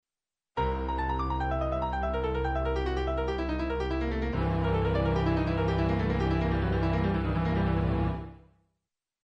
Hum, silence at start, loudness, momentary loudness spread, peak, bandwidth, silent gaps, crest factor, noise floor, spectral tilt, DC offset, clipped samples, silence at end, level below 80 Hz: none; 0.55 s; -29 LUFS; 4 LU; -16 dBFS; 6.4 kHz; none; 12 dB; under -90 dBFS; -8.5 dB/octave; under 0.1%; under 0.1%; 0.85 s; -34 dBFS